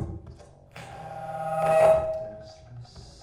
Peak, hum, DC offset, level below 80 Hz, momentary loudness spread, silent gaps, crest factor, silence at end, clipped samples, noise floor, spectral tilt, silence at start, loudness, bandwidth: -8 dBFS; none; under 0.1%; -50 dBFS; 26 LU; none; 18 dB; 0.15 s; under 0.1%; -48 dBFS; -6 dB/octave; 0 s; -24 LUFS; 13 kHz